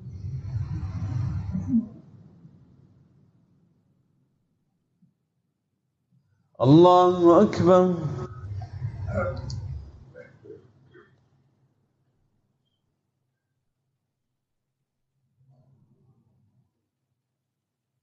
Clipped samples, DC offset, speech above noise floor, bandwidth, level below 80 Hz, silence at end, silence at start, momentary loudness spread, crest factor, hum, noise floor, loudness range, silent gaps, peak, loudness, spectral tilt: under 0.1%; under 0.1%; 65 dB; 7.6 kHz; -50 dBFS; 7.5 s; 0 s; 20 LU; 22 dB; none; -83 dBFS; 16 LU; none; -6 dBFS; -22 LUFS; -8.5 dB/octave